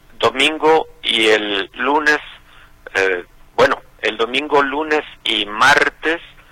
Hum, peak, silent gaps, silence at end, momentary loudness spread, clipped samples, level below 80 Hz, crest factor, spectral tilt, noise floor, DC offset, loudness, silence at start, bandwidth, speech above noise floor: none; 0 dBFS; none; 0.25 s; 8 LU; under 0.1%; -46 dBFS; 18 dB; -2.5 dB/octave; -44 dBFS; under 0.1%; -16 LUFS; 0.2 s; 16.5 kHz; 28 dB